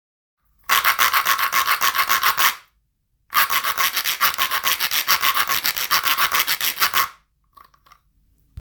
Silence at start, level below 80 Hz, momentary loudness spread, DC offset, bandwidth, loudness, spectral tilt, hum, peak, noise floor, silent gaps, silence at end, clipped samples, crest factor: 0.7 s; -60 dBFS; 3 LU; under 0.1%; over 20 kHz; -18 LUFS; 1.5 dB/octave; none; 0 dBFS; -68 dBFS; none; 0 s; under 0.1%; 22 dB